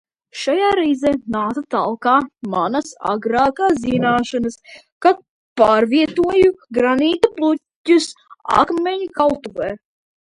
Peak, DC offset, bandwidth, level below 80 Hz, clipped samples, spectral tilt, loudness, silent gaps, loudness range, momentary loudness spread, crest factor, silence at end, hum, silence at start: 0 dBFS; under 0.1%; 11.5 kHz; -50 dBFS; under 0.1%; -5 dB/octave; -18 LUFS; 4.92-5.01 s, 5.29-5.56 s, 7.76-7.85 s; 3 LU; 10 LU; 18 dB; 0.5 s; none; 0.35 s